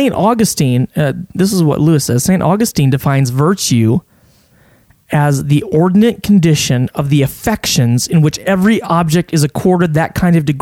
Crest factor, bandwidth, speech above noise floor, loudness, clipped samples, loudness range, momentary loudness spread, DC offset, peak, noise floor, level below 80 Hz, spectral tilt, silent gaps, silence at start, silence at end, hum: 12 dB; 17 kHz; 37 dB; -12 LUFS; under 0.1%; 2 LU; 4 LU; under 0.1%; 0 dBFS; -49 dBFS; -40 dBFS; -5.5 dB/octave; none; 0 s; 0 s; none